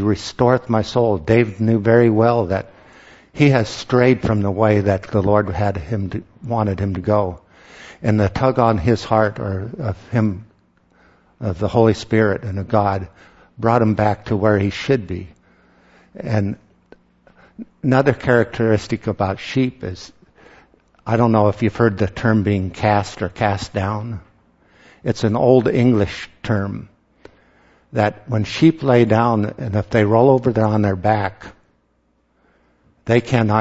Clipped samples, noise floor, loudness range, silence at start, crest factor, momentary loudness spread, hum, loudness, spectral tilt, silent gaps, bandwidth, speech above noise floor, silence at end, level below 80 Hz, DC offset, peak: under 0.1%; -63 dBFS; 4 LU; 0 s; 18 dB; 13 LU; none; -18 LUFS; -7.5 dB/octave; none; 8 kHz; 46 dB; 0 s; -44 dBFS; under 0.1%; 0 dBFS